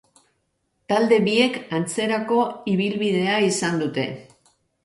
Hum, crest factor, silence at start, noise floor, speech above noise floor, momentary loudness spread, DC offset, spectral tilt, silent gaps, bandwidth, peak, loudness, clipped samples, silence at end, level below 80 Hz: none; 16 dB; 0.9 s; -72 dBFS; 51 dB; 8 LU; under 0.1%; -4.5 dB/octave; none; 11.5 kHz; -6 dBFS; -21 LUFS; under 0.1%; 0.6 s; -66 dBFS